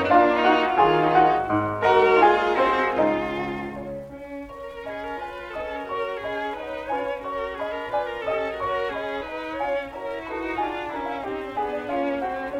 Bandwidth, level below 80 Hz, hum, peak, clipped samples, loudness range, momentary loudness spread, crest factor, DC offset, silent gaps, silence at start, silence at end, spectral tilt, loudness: 12 kHz; -52 dBFS; none; -6 dBFS; under 0.1%; 11 LU; 15 LU; 18 dB; under 0.1%; none; 0 s; 0 s; -6 dB/octave; -24 LUFS